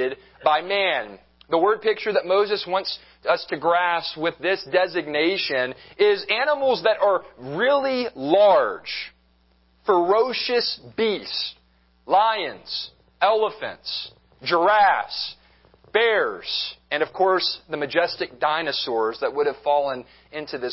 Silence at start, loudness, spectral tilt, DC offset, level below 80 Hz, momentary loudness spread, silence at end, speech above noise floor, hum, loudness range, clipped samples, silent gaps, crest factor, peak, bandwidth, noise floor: 0 s; -22 LUFS; -7 dB/octave; under 0.1%; -64 dBFS; 11 LU; 0 s; 39 dB; none; 3 LU; under 0.1%; none; 20 dB; -4 dBFS; 5.8 kHz; -61 dBFS